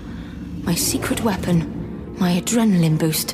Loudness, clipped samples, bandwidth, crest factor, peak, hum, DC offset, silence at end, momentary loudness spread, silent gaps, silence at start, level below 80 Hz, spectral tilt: -20 LUFS; under 0.1%; 16 kHz; 14 dB; -8 dBFS; none; under 0.1%; 0 s; 14 LU; none; 0 s; -40 dBFS; -5 dB/octave